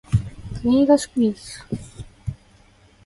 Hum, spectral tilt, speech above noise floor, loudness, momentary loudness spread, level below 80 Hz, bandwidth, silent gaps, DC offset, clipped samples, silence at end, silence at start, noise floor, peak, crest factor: none; -7 dB/octave; 34 dB; -21 LUFS; 18 LU; -40 dBFS; 11.5 kHz; none; under 0.1%; under 0.1%; 0.75 s; 0.1 s; -53 dBFS; -4 dBFS; 18 dB